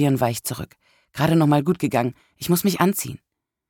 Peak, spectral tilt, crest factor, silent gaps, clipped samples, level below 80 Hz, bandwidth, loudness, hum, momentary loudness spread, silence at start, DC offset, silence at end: -4 dBFS; -6 dB/octave; 18 dB; none; under 0.1%; -54 dBFS; 19 kHz; -21 LUFS; none; 16 LU; 0 s; under 0.1%; 0.55 s